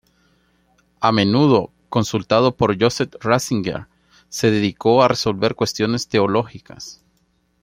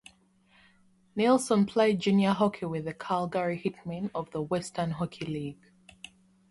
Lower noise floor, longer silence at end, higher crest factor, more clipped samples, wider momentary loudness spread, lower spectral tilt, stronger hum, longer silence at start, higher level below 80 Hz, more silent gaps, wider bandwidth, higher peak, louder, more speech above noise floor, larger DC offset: about the same, -64 dBFS vs -64 dBFS; second, 0.7 s vs 0.95 s; about the same, 18 dB vs 18 dB; neither; about the same, 16 LU vs 15 LU; about the same, -5.5 dB/octave vs -6 dB/octave; neither; second, 1 s vs 1.15 s; first, -52 dBFS vs -64 dBFS; neither; first, 16 kHz vs 11.5 kHz; first, -2 dBFS vs -12 dBFS; first, -18 LUFS vs -29 LUFS; first, 46 dB vs 35 dB; neither